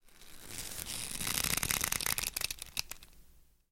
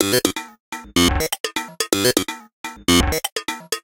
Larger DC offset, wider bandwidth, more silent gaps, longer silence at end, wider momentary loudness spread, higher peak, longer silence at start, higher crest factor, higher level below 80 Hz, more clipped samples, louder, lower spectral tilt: neither; about the same, 17 kHz vs 17 kHz; second, none vs 0.60-0.72 s, 1.40-1.44 s, 2.53-2.64 s, 3.32-3.36 s; first, 0.3 s vs 0.05 s; about the same, 15 LU vs 15 LU; second, -8 dBFS vs 0 dBFS; about the same, 0.05 s vs 0 s; first, 30 dB vs 20 dB; second, -52 dBFS vs -34 dBFS; neither; second, -34 LUFS vs -20 LUFS; second, -0.5 dB/octave vs -3 dB/octave